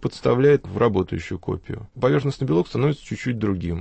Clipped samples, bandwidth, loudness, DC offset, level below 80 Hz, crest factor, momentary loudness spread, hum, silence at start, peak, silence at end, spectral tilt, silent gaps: under 0.1%; 8.6 kHz; -22 LUFS; under 0.1%; -46 dBFS; 16 dB; 11 LU; none; 0 s; -6 dBFS; 0 s; -8 dB/octave; none